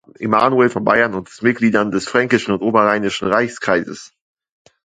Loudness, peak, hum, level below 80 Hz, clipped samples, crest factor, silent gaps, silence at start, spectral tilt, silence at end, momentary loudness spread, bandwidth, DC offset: -16 LUFS; 0 dBFS; none; -54 dBFS; under 0.1%; 18 dB; none; 0.2 s; -5.5 dB/octave; 0.8 s; 5 LU; 9.4 kHz; under 0.1%